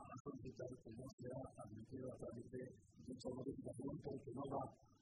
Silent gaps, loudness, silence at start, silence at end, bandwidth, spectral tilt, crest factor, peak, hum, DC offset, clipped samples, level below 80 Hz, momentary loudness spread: 0.20-0.25 s, 1.13-1.18 s; -53 LUFS; 0 s; 0.05 s; 11 kHz; -7.5 dB/octave; 18 dB; -34 dBFS; none; under 0.1%; under 0.1%; -72 dBFS; 8 LU